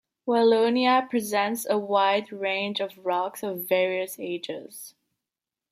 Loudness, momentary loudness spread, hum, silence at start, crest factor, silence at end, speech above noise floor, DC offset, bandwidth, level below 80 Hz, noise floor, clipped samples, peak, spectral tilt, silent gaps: -25 LUFS; 13 LU; none; 0.25 s; 16 dB; 0.8 s; 64 dB; under 0.1%; 16 kHz; -80 dBFS; -89 dBFS; under 0.1%; -8 dBFS; -3.5 dB/octave; none